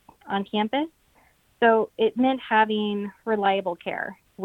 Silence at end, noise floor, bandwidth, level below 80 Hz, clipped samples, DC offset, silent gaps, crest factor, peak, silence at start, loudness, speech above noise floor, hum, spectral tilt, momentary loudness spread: 0 s; -61 dBFS; 4.5 kHz; -66 dBFS; under 0.1%; under 0.1%; none; 20 dB; -6 dBFS; 0.25 s; -24 LUFS; 37 dB; none; -7 dB/octave; 10 LU